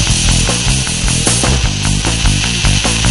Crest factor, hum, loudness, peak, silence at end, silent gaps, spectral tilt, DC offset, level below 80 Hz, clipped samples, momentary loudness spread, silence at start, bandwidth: 12 dB; none; -12 LUFS; 0 dBFS; 0 s; none; -3 dB/octave; 1%; -18 dBFS; under 0.1%; 3 LU; 0 s; 12 kHz